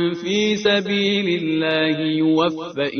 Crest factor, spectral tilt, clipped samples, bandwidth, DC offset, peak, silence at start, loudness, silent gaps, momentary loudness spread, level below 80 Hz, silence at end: 14 dB; -5 dB/octave; under 0.1%; 6.6 kHz; under 0.1%; -4 dBFS; 0 s; -19 LUFS; none; 3 LU; -60 dBFS; 0 s